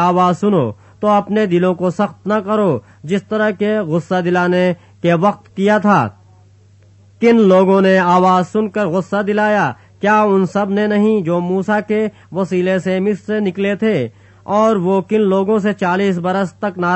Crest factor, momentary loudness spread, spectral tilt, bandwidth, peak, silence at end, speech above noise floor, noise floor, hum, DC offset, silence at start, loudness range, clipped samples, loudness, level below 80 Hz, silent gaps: 14 dB; 8 LU; -7.5 dB/octave; 8.4 kHz; 0 dBFS; 0 s; 32 dB; -47 dBFS; none; under 0.1%; 0 s; 3 LU; under 0.1%; -15 LUFS; -60 dBFS; none